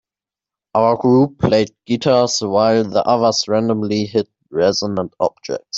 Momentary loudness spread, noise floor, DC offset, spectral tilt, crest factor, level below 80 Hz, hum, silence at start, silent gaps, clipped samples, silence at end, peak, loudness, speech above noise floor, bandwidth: 8 LU; -89 dBFS; under 0.1%; -5 dB/octave; 14 dB; -50 dBFS; none; 0.75 s; none; under 0.1%; 0 s; -2 dBFS; -17 LUFS; 73 dB; 8 kHz